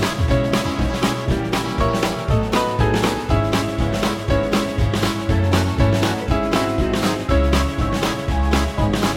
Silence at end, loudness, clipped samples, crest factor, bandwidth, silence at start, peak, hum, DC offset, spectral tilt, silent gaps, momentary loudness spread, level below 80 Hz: 0 s; -19 LUFS; under 0.1%; 16 dB; 16.5 kHz; 0 s; -4 dBFS; none; under 0.1%; -5.5 dB/octave; none; 3 LU; -26 dBFS